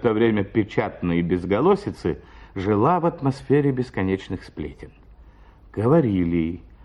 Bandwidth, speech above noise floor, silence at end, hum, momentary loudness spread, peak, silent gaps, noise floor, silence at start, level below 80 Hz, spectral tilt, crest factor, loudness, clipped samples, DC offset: 10.5 kHz; 27 dB; 0.25 s; none; 15 LU; -6 dBFS; none; -48 dBFS; 0 s; -46 dBFS; -9 dB/octave; 16 dB; -22 LUFS; under 0.1%; under 0.1%